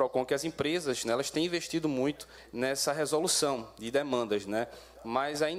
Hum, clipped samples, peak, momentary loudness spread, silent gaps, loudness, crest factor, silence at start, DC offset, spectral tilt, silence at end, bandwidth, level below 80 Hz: none; under 0.1%; -14 dBFS; 7 LU; none; -31 LUFS; 16 dB; 0 s; under 0.1%; -3.5 dB/octave; 0 s; 16 kHz; -64 dBFS